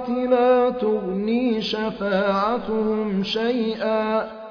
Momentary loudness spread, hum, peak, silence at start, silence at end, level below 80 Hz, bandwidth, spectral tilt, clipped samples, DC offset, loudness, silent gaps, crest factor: 6 LU; none; -6 dBFS; 0 s; 0 s; -54 dBFS; 5.4 kHz; -7 dB/octave; under 0.1%; under 0.1%; -22 LUFS; none; 14 dB